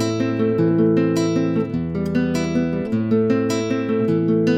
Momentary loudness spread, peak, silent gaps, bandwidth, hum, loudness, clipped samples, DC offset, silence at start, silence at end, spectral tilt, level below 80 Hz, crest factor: 5 LU; -6 dBFS; none; 13.5 kHz; none; -20 LUFS; under 0.1%; under 0.1%; 0 s; 0 s; -7 dB/octave; -48 dBFS; 14 dB